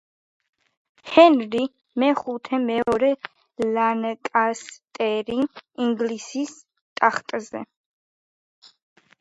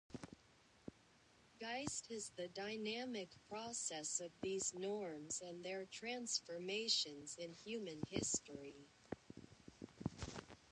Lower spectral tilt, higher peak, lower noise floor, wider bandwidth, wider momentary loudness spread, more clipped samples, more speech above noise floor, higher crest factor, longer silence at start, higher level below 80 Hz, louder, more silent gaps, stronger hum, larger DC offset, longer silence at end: first, -4.5 dB/octave vs -2.5 dB/octave; first, 0 dBFS vs -24 dBFS; first, under -90 dBFS vs -71 dBFS; about the same, 10.5 kHz vs 11 kHz; about the same, 16 LU vs 18 LU; neither; first, over 68 dB vs 25 dB; about the same, 22 dB vs 24 dB; first, 1.05 s vs 0.1 s; first, -64 dBFS vs -72 dBFS; first, -22 LUFS vs -45 LUFS; first, 6.81-6.96 s vs none; neither; neither; first, 1.55 s vs 0 s